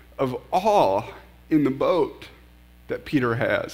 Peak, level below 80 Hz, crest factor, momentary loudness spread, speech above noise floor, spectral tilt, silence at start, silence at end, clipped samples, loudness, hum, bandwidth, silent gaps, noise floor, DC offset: -6 dBFS; -52 dBFS; 18 dB; 14 LU; 28 dB; -6.5 dB/octave; 0.2 s; 0 s; under 0.1%; -23 LUFS; 60 Hz at -50 dBFS; 16 kHz; none; -50 dBFS; under 0.1%